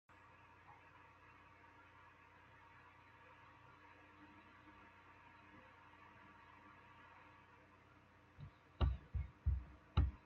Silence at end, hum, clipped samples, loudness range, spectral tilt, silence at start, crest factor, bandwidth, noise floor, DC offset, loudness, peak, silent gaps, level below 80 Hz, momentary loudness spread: 0.1 s; none; under 0.1%; 15 LU; -6.5 dB/octave; 0.7 s; 24 dB; 5 kHz; -67 dBFS; under 0.1%; -45 LUFS; -24 dBFS; none; -52 dBFS; 21 LU